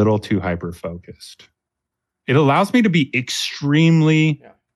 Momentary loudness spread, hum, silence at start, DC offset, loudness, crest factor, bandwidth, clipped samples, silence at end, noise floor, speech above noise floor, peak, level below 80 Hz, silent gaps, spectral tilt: 16 LU; none; 0 s; under 0.1%; -17 LUFS; 14 dB; 12.5 kHz; under 0.1%; 0.4 s; -81 dBFS; 64 dB; -4 dBFS; -52 dBFS; none; -6 dB/octave